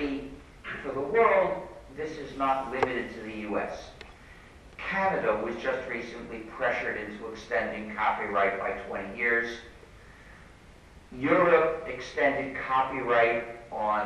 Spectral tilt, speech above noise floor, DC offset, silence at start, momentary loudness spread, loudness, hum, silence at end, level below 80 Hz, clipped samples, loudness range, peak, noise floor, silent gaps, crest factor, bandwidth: -5.5 dB/octave; 24 dB; under 0.1%; 0 s; 16 LU; -28 LUFS; none; 0 s; -54 dBFS; under 0.1%; 5 LU; -8 dBFS; -52 dBFS; none; 20 dB; 12 kHz